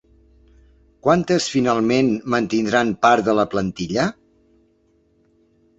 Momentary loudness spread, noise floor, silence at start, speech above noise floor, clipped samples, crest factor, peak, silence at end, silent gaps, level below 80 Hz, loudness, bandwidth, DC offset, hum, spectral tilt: 7 LU; -61 dBFS; 1.05 s; 42 dB; under 0.1%; 18 dB; -2 dBFS; 1.65 s; none; -52 dBFS; -19 LUFS; 8.2 kHz; under 0.1%; none; -5 dB/octave